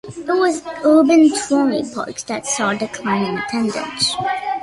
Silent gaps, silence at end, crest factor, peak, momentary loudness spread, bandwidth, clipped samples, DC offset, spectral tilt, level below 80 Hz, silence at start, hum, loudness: none; 0 s; 14 dB; -2 dBFS; 11 LU; 11.5 kHz; under 0.1%; under 0.1%; -3.5 dB/octave; -56 dBFS; 0.05 s; none; -18 LUFS